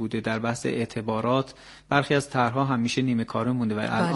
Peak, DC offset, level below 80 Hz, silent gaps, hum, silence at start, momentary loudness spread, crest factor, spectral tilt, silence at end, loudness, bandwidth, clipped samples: -6 dBFS; under 0.1%; -58 dBFS; none; none; 0 s; 5 LU; 20 dB; -6 dB/octave; 0 s; -26 LUFS; 11.5 kHz; under 0.1%